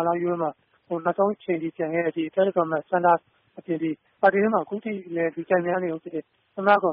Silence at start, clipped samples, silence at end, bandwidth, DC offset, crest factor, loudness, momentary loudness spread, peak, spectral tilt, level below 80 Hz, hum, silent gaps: 0 s; under 0.1%; 0 s; 4 kHz; under 0.1%; 18 dB; -25 LUFS; 11 LU; -6 dBFS; -5.5 dB/octave; -70 dBFS; none; none